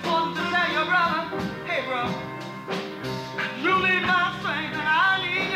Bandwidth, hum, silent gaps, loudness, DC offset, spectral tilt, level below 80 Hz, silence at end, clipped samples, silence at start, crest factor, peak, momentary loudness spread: 16 kHz; none; none; -24 LUFS; under 0.1%; -4.5 dB/octave; -58 dBFS; 0 s; under 0.1%; 0 s; 14 dB; -12 dBFS; 11 LU